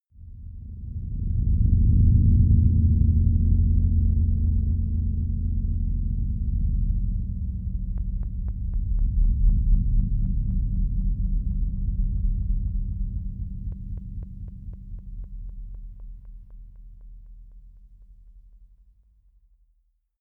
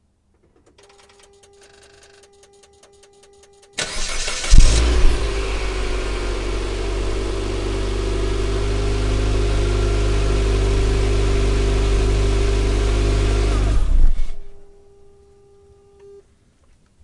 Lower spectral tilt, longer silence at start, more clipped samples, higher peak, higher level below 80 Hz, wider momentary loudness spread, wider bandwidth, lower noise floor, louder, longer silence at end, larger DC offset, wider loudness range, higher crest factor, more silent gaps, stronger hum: first, -14.5 dB/octave vs -5 dB/octave; second, 0.2 s vs 3.75 s; neither; second, -8 dBFS vs 0 dBFS; second, -26 dBFS vs -20 dBFS; first, 21 LU vs 7 LU; second, 0.7 kHz vs 11 kHz; first, -67 dBFS vs -60 dBFS; second, -25 LUFS vs -21 LUFS; second, 1.8 s vs 2.4 s; neither; first, 20 LU vs 7 LU; about the same, 16 dB vs 18 dB; neither; neither